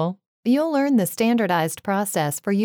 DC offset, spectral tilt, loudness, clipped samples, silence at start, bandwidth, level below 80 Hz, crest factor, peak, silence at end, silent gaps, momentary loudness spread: under 0.1%; -5 dB/octave; -22 LUFS; under 0.1%; 0 s; over 20 kHz; -70 dBFS; 14 dB; -6 dBFS; 0 s; 0.27-0.43 s; 4 LU